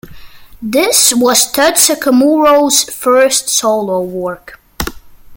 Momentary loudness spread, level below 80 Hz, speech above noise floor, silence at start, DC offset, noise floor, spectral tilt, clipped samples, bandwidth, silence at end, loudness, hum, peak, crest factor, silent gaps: 15 LU; -40 dBFS; 21 dB; 0.05 s; under 0.1%; -32 dBFS; -1.5 dB/octave; under 0.1%; over 20 kHz; 0 s; -10 LUFS; none; 0 dBFS; 12 dB; none